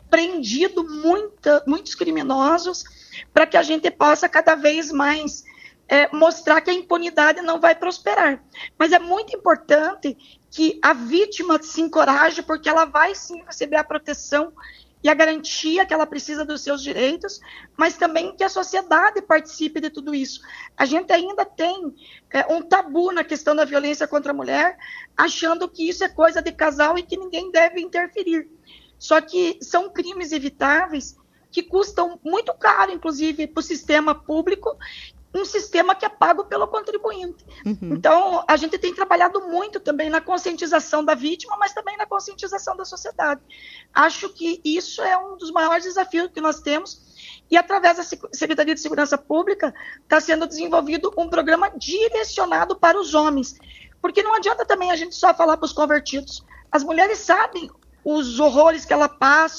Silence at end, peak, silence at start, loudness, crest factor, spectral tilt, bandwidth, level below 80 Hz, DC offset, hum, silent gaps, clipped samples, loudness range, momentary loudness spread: 0 s; 0 dBFS; 0.1 s; -20 LUFS; 20 dB; -2.5 dB/octave; 7.6 kHz; -54 dBFS; under 0.1%; none; none; under 0.1%; 4 LU; 12 LU